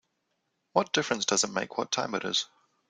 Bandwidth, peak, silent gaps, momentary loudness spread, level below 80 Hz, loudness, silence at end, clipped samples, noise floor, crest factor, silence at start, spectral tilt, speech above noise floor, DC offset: 11 kHz; -8 dBFS; none; 5 LU; -74 dBFS; -28 LUFS; 0.45 s; under 0.1%; -78 dBFS; 24 dB; 0.75 s; -2 dB/octave; 49 dB; under 0.1%